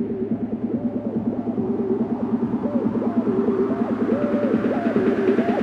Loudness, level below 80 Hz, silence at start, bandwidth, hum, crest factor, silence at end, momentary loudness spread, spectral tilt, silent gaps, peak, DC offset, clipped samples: -22 LUFS; -54 dBFS; 0 s; 5.4 kHz; none; 16 dB; 0 s; 5 LU; -9.5 dB/octave; none; -6 dBFS; under 0.1%; under 0.1%